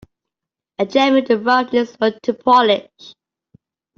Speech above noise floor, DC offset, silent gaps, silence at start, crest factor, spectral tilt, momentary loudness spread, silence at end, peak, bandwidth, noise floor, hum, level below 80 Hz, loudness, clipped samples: 69 dB; under 0.1%; none; 0.8 s; 16 dB; -5 dB/octave; 8 LU; 0.85 s; -2 dBFS; 7.2 kHz; -85 dBFS; none; -62 dBFS; -16 LUFS; under 0.1%